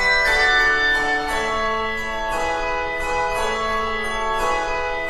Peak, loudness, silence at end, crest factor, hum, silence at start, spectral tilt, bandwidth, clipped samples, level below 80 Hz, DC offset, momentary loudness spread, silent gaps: -6 dBFS; -20 LUFS; 0 s; 14 dB; none; 0 s; -2.5 dB/octave; 13.5 kHz; under 0.1%; -34 dBFS; under 0.1%; 8 LU; none